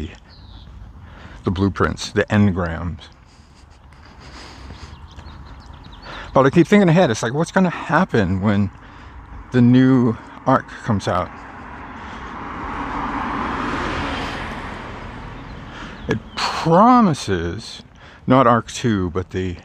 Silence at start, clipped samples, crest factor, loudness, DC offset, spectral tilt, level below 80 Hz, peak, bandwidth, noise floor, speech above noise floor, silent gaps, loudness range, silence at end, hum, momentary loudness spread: 0 s; under 0.1%; 20 dB; -18 LUFS; under 0.1%; -6.5 dB/octave; -40 dBFS; 0 dBFS; 10 kHz; -46 dBFS; 30 dB; none; 9 LU; 0.05 s; none; 25 LU